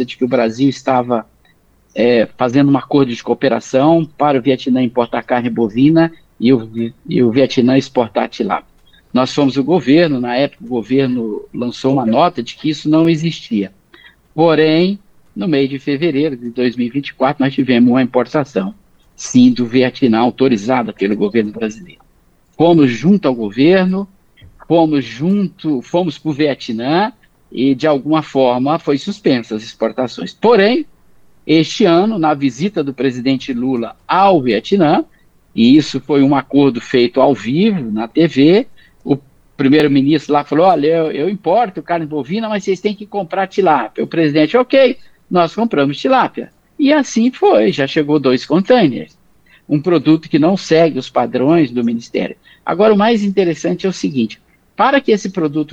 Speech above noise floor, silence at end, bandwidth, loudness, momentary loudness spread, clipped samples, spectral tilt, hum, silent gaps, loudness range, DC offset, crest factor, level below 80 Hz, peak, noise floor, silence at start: 39 dB; 0.05 s; 8 kHz; -14 LUFS; 9 LU; under 0.1%; -6.5 dB/octave; none; none; 3 LU; under 0.1%; 14 dB; -54 dBFS; 0 dBFS; -52 dBFS; 0 s